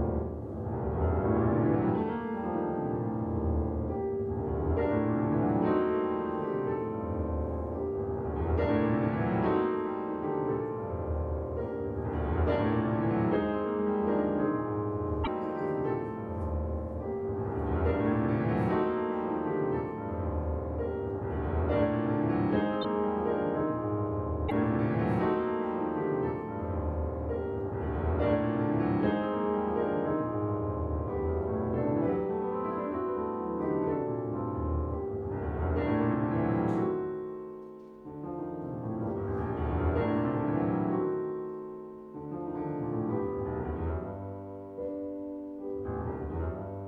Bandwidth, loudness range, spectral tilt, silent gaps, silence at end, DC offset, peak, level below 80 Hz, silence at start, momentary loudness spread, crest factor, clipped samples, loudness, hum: 4.7 kHz; 4 LU; -10.5 dB/octave; none; 0 s; under 0.1%; -14 dBFS; -42 dBFS; 0 s; 8 LU; 16 dB; under 0.1%; -31 LUFS; none